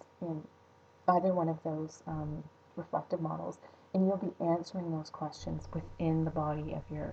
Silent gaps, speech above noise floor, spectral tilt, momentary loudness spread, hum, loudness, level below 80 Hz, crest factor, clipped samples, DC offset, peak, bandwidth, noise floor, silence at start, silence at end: none; 28 dB; -8.5 dB/octave; 12 LU; none; -35 LUFS; -58 dBFS; 20 dB; under 0.1%; under 0.1%; -14 dBFS; 8 kHz; -62 dBFS; 0.2 s; 0 s